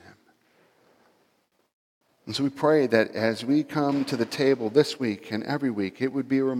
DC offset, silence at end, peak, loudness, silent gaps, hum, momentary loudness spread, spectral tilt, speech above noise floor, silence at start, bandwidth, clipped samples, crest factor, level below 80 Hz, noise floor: under 0.1%; 0 s; -6 dBFS; -25 LUFS; none; none; 7 LU; -6 dB/octave; 45 dB; 2.25 s; 15 kHz; under 0.1%; 20 dB; -76 dBFS; -69 dBFS